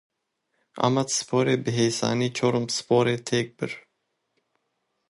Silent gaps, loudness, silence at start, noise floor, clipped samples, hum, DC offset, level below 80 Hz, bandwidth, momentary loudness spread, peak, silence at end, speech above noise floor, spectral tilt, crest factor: none; -24 LUFS; 0.75 s; -76 dBFS; under 0.1%; none; under 0.1%; -66 dBFS; 11.5 kHz; 8 LU; -4 dBFS; 1.3 s; 52 dB; -4.5 dB/octave; 22 dB